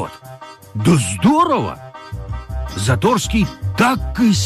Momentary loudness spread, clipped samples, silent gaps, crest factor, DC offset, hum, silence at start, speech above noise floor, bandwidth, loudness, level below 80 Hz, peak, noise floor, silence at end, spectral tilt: 18 LU; under 0.1%; none; 14 dB; under 0.1%; none; 0 s; 22 dB; 15.5 kHz; -17 LUFS; -30 dBFS; -4 dBFS; -37 dBFS; 0 s; -5.5 dB/octave